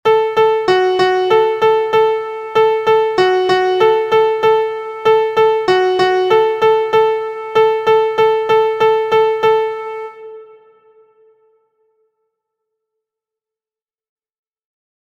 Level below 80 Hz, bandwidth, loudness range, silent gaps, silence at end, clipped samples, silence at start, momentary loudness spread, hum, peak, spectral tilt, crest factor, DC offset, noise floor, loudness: -56 dBFS; 8 kHz; 5 LU; none; 4.6 s; under 0.1%; 0.05 s; 6 LU; none; 0 dBFS; -5 dB/octave; 14 dB; under 0.1%; under -90 dBFS; -13 LUFS